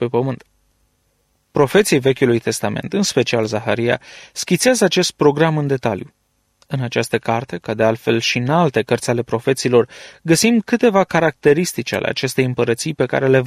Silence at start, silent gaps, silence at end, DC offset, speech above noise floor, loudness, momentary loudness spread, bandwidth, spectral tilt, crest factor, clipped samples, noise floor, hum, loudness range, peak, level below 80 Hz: 0 s; none; 0 s; under 0.1%; 47 dB; -17 LUFS; 9 LU; 15.5 kHz; -5 dB/octave; 16 dB; under 0.1%; -64 dBFS; none; 3 LU; -2 dBFS; -54 dBFS